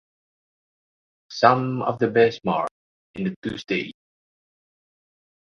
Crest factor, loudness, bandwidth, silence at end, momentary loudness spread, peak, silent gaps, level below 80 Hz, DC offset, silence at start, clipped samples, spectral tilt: 26 dB; -23 LUFS; 7 kHz; 1.5 s; 15 LU; 0 dBFS; 2.71-3.14 s, 3.36-3.42 s; -62 dBFS; under 0.1%; 1.3 s; under 0.1%; -6.5 dB/octave